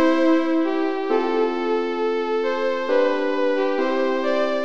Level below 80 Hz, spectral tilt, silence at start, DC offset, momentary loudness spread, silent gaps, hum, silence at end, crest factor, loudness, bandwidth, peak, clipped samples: -72 dBFS; -4.5 dB/octave; 0 s; 2%; 4 LU; none; none; 0 s; 14 dB; -21 LUFS; 7.2 kHz; -8 dBFS; under 0.1%